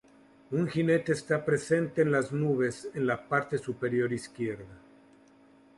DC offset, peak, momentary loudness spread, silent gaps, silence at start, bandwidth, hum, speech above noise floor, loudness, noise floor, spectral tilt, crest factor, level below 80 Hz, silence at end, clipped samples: under 0.1%; -14 dBFS; 8 LU; none; 0.5 s; 11.5 kHz; none; 30 dB; -29 LUFS; -59 dBFS; -6.5 dB/octave; 18 dB; -66 dBFS; 1 s; under 0.1%